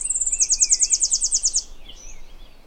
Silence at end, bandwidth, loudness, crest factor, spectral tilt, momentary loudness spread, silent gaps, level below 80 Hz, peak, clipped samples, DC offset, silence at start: 0.15 s; 17 kHz; -17 LUFS; 20 dB; 3 dB/octave; 5 LU; none; -40 dBFS; -4 dBFS; under 0.1%; under 0.1%; 0 s